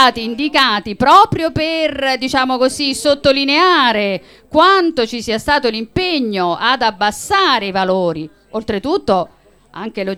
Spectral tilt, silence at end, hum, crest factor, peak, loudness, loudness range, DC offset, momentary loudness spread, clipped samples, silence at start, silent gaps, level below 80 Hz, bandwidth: -4 dB/octave; 0 s; none; 14 dB; 0 dBFS; -14 LUFS; 3 LU; under 0.1%; 10 LU; under 0.1%; 0 s; none; -44 dBFS; 16.5 kHz